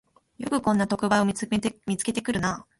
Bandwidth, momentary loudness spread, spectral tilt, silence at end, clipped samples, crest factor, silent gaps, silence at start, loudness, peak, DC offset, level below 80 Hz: 11.5 kHz; 6 LU; -5 dB/octave; 0.2 s; under 0.1%; 18 dB; none; 0.4 s; -26 LUFS; -8 dBFS; under 0.1%; -54 dBFS